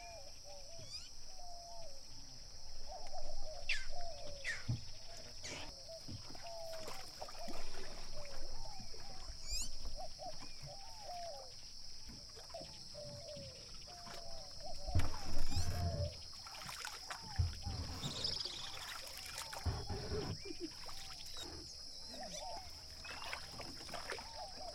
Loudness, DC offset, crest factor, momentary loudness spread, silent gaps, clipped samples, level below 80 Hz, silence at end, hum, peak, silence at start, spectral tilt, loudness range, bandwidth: -46 LUFS; under 0.1%; 20 dB; 10 LU; none; under 0.1%; -48 dBFS; 0 s; none; -20 dBFS; 0 s; -3.5 dB/octave; 7 LU; 15 kHz